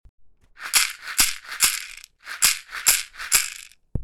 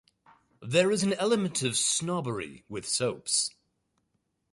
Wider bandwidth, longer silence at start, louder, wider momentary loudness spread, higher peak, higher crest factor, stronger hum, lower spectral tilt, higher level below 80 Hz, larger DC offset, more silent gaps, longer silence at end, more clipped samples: first, 19.5 kHz vs 11.5 kHz; second, 0.2 s vs 0.6 s; first, -20 LUFS vs -28 LUFS; first, 18 LU vs 12 LU; first, -2 dBFS vs -10 dBFS; about the same, 24 dB vs 20 dB; neither; second, 1 dB/octave vs -3 dB/octave; first, -44 dBFS vs -68 dBFS; neither; neither; second, 0 s vs 1.05 s; neither